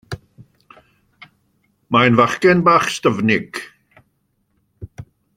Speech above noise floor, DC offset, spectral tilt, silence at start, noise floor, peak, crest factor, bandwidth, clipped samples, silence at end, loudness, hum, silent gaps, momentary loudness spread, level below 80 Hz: 52 dB; under 0.1%; -5.5 dB/octave; 0.1 s; -67 dBFS; -2 dBFS; 18 dB; 16 kHz; under 0.1%; 0.35 s; -15 LUFS; none; none; 25 LU; -54 dBFS